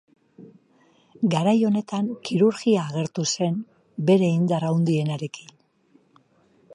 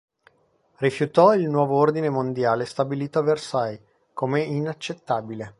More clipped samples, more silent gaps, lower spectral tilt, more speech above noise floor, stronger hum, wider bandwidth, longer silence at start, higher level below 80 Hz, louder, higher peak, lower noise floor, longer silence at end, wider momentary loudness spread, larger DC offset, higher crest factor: neither; neither; about the same, -6 dB/octave vs -7 dB/octave; about the same, 39 dB vs 42 dB; neither; about the same, 11 kHz vs 11.5 kHz; second, 0.4 s vs 0.8 s; about the same, -70 dBFS vs -66 dBFS; about the same, -23 LUFS vs -23 LUFS; second, -8 dBFS vs -2 dBFS; about the same, -61 dBFS vs -64 dBFS; about the same, 0 s vs 0.1 s; about the same, 11 LU vs 12 LU; neither; about the same, 16 dB vs 20 dB